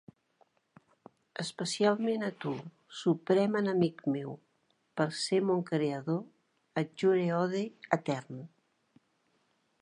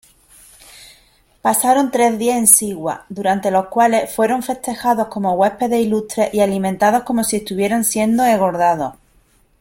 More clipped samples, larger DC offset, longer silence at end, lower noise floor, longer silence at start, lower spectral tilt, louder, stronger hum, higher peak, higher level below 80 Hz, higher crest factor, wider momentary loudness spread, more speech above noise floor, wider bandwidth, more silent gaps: neither; neither; first, 1.35 s vs 0.7 s; first, -74 dBFS vs -55 dBFS; first, 1.4 s vs 0.8 s; first, -6 dB/octave vs -4 dB/octave; second, -32 LUFS vs -16 LUFS; neither; second, -10 dBFS vs 0 dBFS; second, -80 dBFS vs -52 dBFS; first, 24 dB vs 18 dB; first, 15 LU vs 7 LU; first, 44 dB vs 39 dB; second, 11 kHz vs 16.5 kHz; neither